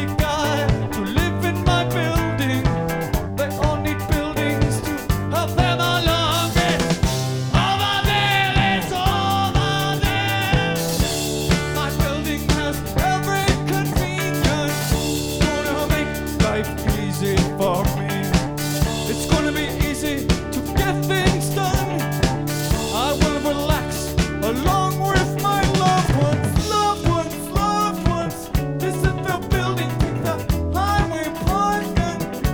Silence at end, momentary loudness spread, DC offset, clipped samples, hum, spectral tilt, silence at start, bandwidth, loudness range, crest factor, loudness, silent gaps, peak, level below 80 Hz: 0 s; 5 LU; under 0.1%; under 0.1%; none; -5 dB/octave; 0 s; over 20 kHz; 3 LU; 18 dB; -20 LUFS; none; -2 dBFS; -30 dBFS